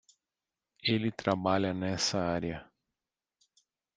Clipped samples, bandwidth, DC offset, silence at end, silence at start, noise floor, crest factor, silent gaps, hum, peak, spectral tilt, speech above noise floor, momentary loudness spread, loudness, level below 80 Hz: under 0.1%; 9.6 kHz; under 0.1%; 1.35 s; 0.85 s; under -90 dBFS; 24 dB; none; none; -10 dBFS; -4.5 dB/octave; over 59 dB; 6 LU; -31 LUFS; -64 dBFS